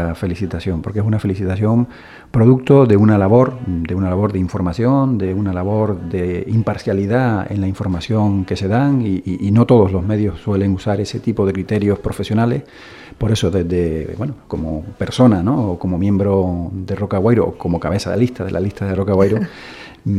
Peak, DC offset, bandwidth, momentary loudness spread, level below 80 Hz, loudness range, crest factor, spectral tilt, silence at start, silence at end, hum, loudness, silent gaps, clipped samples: 0 dBFS; under 0.1%; 12 kHz; 11 LU; -38 dBFS; 4 LU; 16 dB; -8 dB/octave; 0 s; 0 s; none; -17 LUFS; none; under 0.1%